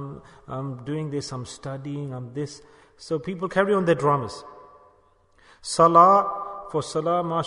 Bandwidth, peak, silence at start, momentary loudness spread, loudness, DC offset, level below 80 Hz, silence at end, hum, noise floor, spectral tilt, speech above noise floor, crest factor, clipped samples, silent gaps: 11 kHz; -2 dBFS; 0 s; 19 LU; -23 LUFS; under 0.1%; -60 dBFS; 0 s; none; -60 dBFS; -5.5 dB/octave; 36 dB; 22 dB; under 0.1%; none